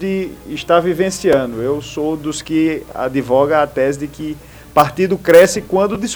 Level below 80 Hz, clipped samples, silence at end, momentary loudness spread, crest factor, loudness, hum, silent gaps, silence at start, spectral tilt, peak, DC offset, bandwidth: -44 dBFS; 0.1%; 0 s; 14 LU; 16 dB; -15 LUFS; none; none; 0 s; -5 dB/octave; 0 dBFS; under 0.1%; over 20 kHz